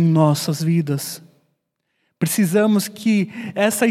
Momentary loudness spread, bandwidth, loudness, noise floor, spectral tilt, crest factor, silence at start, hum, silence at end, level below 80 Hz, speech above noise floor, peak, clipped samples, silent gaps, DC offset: 9 LU; 16 kHz; -19 LUFS; -72 dBFS; -5.5 dB/octave; 16 dB; 0 s; none; 0 s; -70 dBFS; 54 dB; -2 dBFS; under 0.1%; none; under 0.1%